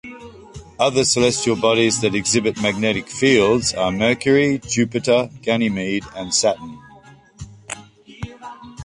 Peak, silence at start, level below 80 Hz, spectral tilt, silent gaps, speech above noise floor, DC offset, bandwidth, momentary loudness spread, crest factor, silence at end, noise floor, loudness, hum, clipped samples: -2 dBFS; 0.05 s; -48 dBFS; -3.5 dB/octave; none; 28 dB; under 0.1%; 11.5 kHz; 20 LU; 18 dB; 0 s; -46 dBFS; -18 LUFS; none; under 0.1%